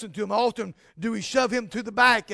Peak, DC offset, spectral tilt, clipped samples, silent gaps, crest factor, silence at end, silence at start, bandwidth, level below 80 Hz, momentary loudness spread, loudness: -6 dBFS; under 0.1%; -3.5 dB/octave; under 0.1%; none; 20 dB; 0 s; 0 s; 11 kHz; -60 dBFS; 14 LU; -24 LUFS